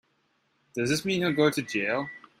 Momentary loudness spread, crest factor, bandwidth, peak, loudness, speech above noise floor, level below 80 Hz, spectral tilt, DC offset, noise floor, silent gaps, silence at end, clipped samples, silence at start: 11 LU; 18 dB; 16 kHz; -10 dBFS; -27 LUFS; 45 dB; -66 dBFS; -4.5 dB/octave; under 0.1%; -71 dBFS; none; 0.2 s; under 0.1%; 0.75 s